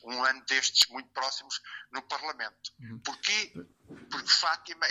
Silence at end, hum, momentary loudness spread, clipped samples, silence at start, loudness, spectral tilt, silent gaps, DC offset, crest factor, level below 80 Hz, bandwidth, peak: 0 s; none; 16 LU; under 0.1%; 0.05 s; -28 LUFS; 0.5 dB/octave; none; under 0.1%; 24 dB; -76 dBFS; 15 kHz; -6 dBFS